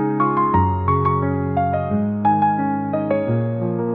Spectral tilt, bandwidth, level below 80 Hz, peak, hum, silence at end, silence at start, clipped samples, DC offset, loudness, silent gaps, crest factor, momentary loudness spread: -12.5 dB/octave; 4.2 kHz; -50 dBFS; -4 dBFS; none; 0 s; 0 s; under 0.1%; 0.2%; -19 LUFS; none; 14 dB; 4 LU